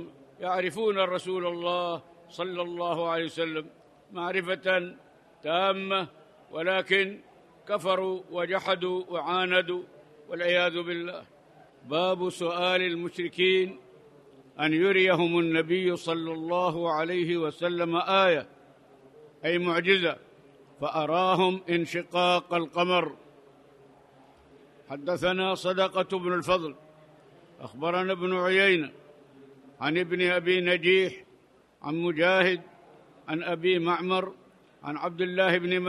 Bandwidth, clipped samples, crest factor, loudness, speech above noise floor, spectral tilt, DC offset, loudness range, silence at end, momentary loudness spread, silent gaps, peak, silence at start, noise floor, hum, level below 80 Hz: 12 kHz; under 0.1%; 20 dB; -27 LUFS; 33 dB; -5.5 dB/octave; under 0.1%; 4 LU; 0 s; 14 LU; none; -8 dBFS; 0 s; -60 dBFS; none; -70 dBFS